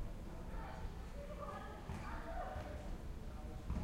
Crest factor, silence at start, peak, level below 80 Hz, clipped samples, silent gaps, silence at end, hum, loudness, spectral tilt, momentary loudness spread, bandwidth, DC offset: 16 dB; 0 s; -30 dBFS; -48 dBFS; under 0.1%; none; 0 s; none; -49 LUFS; -6.5 dB/octave; 4 LU; 16 kHz; under 0.1%